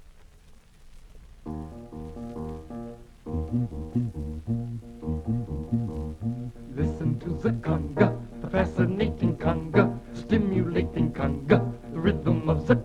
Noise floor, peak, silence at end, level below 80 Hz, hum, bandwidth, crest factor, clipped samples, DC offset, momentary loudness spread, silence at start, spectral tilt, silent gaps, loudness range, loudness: -52 dBFS; -6 dBFS; 0 s; -40 dBFS; none; 8.8 kHz; 22 dB; under 0.1%; under 0.1%; 15 LU; 0.1 s; -9 dB/octave; none; 9 LU; -28 LUFS